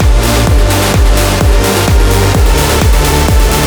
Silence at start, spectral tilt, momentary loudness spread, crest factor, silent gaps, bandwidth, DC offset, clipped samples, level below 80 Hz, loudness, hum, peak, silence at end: 0 s; -4.5 dB/octave; 0 LU; 8 dB; none; over 20 kHz; under 0.1%; under 0.1%; -10 dBFS; -9 LUFS; none; 0 dBFS; 0 s